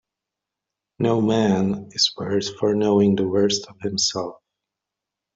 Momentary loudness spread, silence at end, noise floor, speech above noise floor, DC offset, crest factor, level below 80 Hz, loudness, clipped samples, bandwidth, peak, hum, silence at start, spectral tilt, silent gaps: 7 LU; 1.05 s; -85 dBFS; 65 dB; under 0.1%; 16 dB; -60 dBFS; -21 LUFS; under 0.1%; 7.8 kHz; -6 dBFS; none; 1 s; -4.5 dB/octave; none